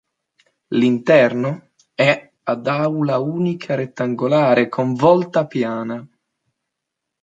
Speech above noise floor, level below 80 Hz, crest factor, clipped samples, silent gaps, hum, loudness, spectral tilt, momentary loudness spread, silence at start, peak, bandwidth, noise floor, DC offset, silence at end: 63 dB; -66 dBFS; 16 dB; under 0.1%; none; none; -18 LUFS; -7.5 dB/octave; 11 LU; 0.7 s; -2 dBFS; 7.8 kHz; -80 dBFS; under 0.1%; 1.15 s